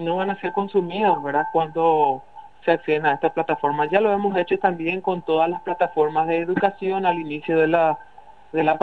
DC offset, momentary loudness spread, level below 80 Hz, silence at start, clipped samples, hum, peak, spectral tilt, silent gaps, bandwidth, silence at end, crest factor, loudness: 0.4%; 5 LU; -64 dBFS; 0 s; under 0.1%; none; -2 dBFS; -8 dB/octave; none; 5.8 kHz; 0 s; 18 dB; -22 LUFS